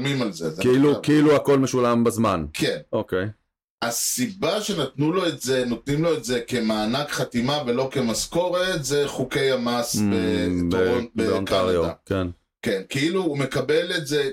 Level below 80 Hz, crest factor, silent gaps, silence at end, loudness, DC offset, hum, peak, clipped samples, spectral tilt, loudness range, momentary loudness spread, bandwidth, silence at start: -50 dBFS; 12 dB; 3.64-3.78 s; 0 s; -23 LUFS; under 0.1%; none; -10 dBFS; under 0.1%; -4.5 dB/octave; 4 LU; 8 LU; 16.5 kHz; 0 s